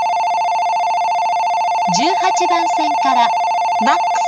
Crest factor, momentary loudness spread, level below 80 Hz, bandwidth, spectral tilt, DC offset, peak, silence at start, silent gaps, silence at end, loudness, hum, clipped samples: 14 dB; 2 LU; -74 dBFS; 11.5 kHz; -2.5 dB/octave; under 0.1%; -2 dBFS; 0 s; none; 0 s; -15 LUFS; none; under 0.1%